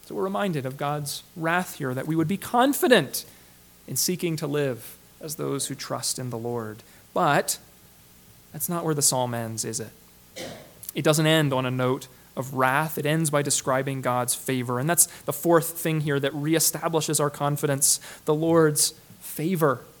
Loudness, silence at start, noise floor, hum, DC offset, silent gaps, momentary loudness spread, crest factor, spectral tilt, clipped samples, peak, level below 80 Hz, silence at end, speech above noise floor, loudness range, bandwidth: -24 LUFS; 0.05 s; -53 dBFS; none; under 0.1%; none; 15 LU; 22 dB; -4 dB/octave; under 0.1%; -4 dBFS; -64 dBFS; 0.1 s; 28 dB; 6 LU; 19 kHz